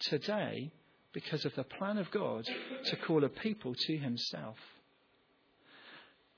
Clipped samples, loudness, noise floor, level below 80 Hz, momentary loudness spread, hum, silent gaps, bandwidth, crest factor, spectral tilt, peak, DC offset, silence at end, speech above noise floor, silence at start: under 0.1%; -37 LUFS; -71 dBFS; -78 dBFS; 22 LU; none; none; 5.4 kHz; 20 dB; -4 dB/octave; -20 dBFS; under 0.1%; 0.3 s; 34 dB; 0 s